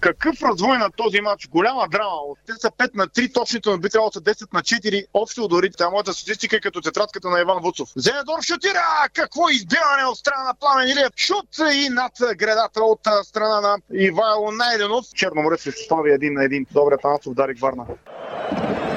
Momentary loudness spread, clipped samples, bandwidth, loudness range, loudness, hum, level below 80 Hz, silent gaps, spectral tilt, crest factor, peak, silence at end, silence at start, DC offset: 6 LU; under 0.1%; 9.8 kHz; 3 LU; -20 LUFS; none; -56 dBFS; none; -3.5 dB/octave; 16 dB; -4 dBFS; 0 s; 0 s; under 0.1%